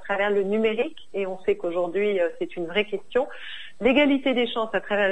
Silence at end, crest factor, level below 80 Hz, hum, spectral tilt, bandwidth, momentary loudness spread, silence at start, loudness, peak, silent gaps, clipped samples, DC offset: 0 s; 16 dB; -54 dBFS; none; -6 dB/octave; 9 kHz; 11 LU; 0.05 s; -24 LUFS; -8 dBFS; none; under 0.1%; 1%